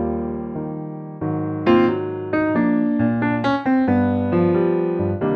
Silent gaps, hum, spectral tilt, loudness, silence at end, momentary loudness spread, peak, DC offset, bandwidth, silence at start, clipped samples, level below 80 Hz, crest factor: none; none; -9.5 dB/octave; -20 LUFS; 0 s; 11 LU; -4 dBFS; under 0.1%; 6.2 kHz; 0 s; under 0.1%; -48 dBFS; 16 dB